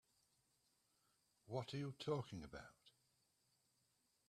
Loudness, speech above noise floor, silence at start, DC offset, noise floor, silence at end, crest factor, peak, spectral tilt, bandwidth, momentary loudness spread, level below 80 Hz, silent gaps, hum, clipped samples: -49 LUFS; 35 dB; 1.45 s; under 0.1%; -83 dBFS; 1.4 s; 24 dB; -30 dBFS; -6.5 dB/octave; 13.5 kHz; 13 LU; -78 dBFS; none; none; under 0.1%